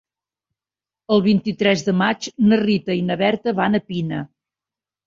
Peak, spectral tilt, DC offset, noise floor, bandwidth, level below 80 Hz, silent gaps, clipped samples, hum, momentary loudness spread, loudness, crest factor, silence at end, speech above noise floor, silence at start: -2 dBFS; -6 dB/octave; under 0.1%; under -90 dBFS; 7.6 kHz; -58 dBFS; none; under 0.1%; none; 9 LU; -19 LUFS; 18 dB; 0.8 s; over 72 dB; 1.1 s